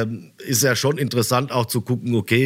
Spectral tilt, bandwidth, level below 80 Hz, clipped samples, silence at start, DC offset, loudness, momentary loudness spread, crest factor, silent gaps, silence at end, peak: -4.5 dB/octave; 16 kHz; -64 dBFS; under 0.1%; 0 s; under 0.1%; -20 LUFS; 5 LU; 16 dB; none; 0 s; -4 dBFS